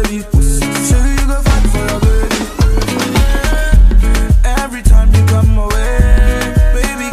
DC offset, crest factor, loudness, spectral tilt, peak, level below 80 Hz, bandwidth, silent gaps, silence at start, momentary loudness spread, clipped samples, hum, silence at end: under 0.1%; 10 dB; -13 LUFS; -5.5 dB/octave; 0 dBFS; -10 dBFS; 15 kHz; none; 0 s; 5 LU; 0.9%; none; 0 s